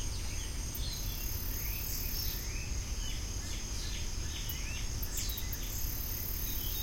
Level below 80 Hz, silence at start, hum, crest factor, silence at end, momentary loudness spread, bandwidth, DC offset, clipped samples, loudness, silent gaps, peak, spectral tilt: -40 dBFS; 0 s; none; 16 dB; 0 s; 4 LU; 16.5 kHz; under 0.1%; under 0.1%; -37 LUFS; none; -20 dBFS; -2.5 dB/octave